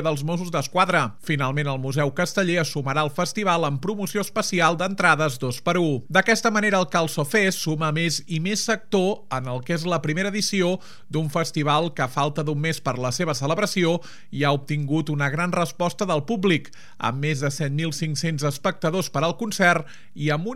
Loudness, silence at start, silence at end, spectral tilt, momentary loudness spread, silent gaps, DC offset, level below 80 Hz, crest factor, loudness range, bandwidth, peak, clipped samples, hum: -23 LUFS; 0 s; 0 s; -5 dB/octave; 6 LU; none; 1%; -66 dBFS; 22 dB; 3 LU; 16 kHz; -2 dBFS; under 0.1%; none